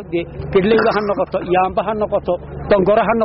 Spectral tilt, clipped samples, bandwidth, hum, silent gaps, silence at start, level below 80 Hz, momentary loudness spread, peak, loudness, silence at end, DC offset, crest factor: -5 dB/octave; under 0.1%; 5.8 kHz; none; none; 0 s; -38 dBFS; 9 LU; -4 dBFS; -17 LUFS; 0 s; under 0.1%; 12 dB